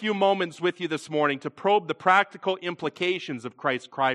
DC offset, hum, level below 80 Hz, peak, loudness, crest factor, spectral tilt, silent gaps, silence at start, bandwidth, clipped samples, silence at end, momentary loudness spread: under 0.1%; none; -78 dBFS; -6 dBFS; -26 LUFS; 20 dB; -5 dB/octave; none; 0 s; 11 kHz; under 0.1%; 0 s; 9 LU